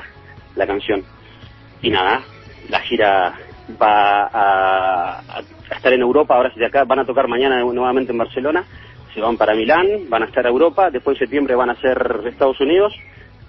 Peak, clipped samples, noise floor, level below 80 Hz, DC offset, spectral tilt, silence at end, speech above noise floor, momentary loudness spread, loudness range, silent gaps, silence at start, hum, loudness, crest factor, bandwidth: 0 dBFS; under 0.1%; -41 dBFS; -46 dBFS; under 0.1%; -7.5 dB/octave; 0.45 s; 25 dB; 9 LU; 2 LU; none; 0 s; none; -17 LUFS; 16 dB; 6 kHz